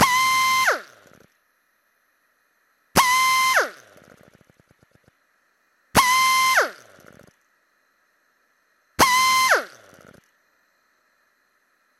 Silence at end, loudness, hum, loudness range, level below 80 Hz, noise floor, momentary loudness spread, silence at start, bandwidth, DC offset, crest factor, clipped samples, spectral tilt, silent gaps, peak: 2.35 s; -18 LUFS; none; 1 LU; -54 dBFS; -67 dBFS; 11 LU; 0 s; 16.5 kHz; under 0.1%; 24 dB; under 0.1%; -1 dB/octave; none; 0 dBFS